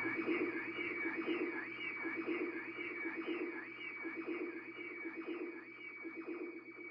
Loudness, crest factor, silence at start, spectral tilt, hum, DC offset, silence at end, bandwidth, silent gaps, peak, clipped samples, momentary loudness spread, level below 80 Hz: -42 LUFS; 18 dB; 0 s; -2.5 dB/octave; none; under 0.1%; 0 s; 5.4 kHz; none; -26 dBFS; under 0.1%; 9 LU; -86 dBFS